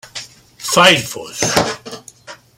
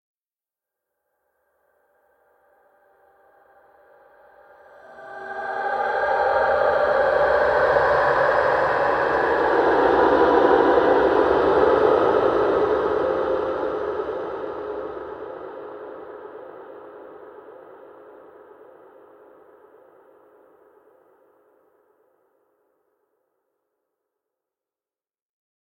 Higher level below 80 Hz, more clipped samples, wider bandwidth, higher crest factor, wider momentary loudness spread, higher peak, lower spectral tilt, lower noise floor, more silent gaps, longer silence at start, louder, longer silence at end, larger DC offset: about the same, -50 dBFS vs -52 dBFS; neither; first, 16.5 kHz vs 8.4 kHz; about the same, 18 dB vs 20 dB; about the same, 22 LU vs 22 LU; first, 0 dBFS vs -4 dBFS; second, -2.5 dB/octave vs -6.5 dB/octave; second, -39 dBFS vs under -90 dBFS; neither; second, 0.05 s vs 4.9 s; first, -14 LUFS vs -20 LUFS; second, 0.25 s vs 7.95 s; neither